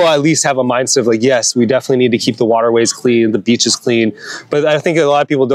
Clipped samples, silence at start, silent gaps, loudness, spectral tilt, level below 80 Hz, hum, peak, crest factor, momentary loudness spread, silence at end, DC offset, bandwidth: under 0.1%; 0 s; none; -12 LUFS; -4 dB/octave; -64 dBFS; none; 0 dBFS; 12 dB; 3 LU; 0 s; under 0.1%; 14 kHz